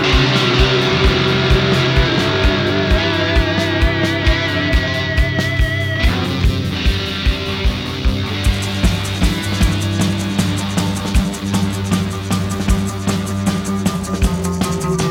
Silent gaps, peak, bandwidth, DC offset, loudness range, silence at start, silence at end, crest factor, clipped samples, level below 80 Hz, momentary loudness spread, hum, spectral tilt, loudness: none; -2 dBFS; 16.5 kHz; under 0.1%; 4 LU; 0 s; 0 s; 14 dB; under 0.1%; -22 dBFS; 6 LU; none; -5 dB/octave; -16 LUFS